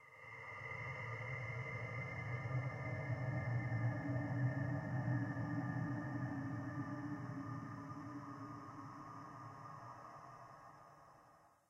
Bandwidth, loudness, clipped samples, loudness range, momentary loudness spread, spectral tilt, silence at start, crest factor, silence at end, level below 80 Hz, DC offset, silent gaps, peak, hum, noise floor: 7.4 kHz; -44 LUFS; under 0.1%; 11 LU; 14 LU; -8.5 dB/octave; 0 s; 16 dB; 0.2 s; -70 dBFS; under 0.1%; none; -28 dBFS; none; -68 dBFS